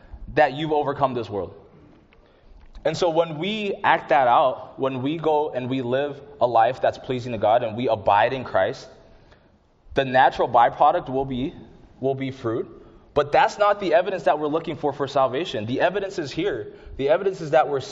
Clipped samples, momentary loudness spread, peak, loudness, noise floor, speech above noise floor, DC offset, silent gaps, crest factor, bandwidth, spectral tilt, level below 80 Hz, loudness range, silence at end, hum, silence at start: under 0.1%; 10 LU; -2 dBFS; -22 LUFS; -57 dBFS; 36 dB; under 0.1%; none; 20 dB; 8 kHz; -3.5 dB/octave; -50 dBFS; 3 LU; 0 s; none; 0.1 s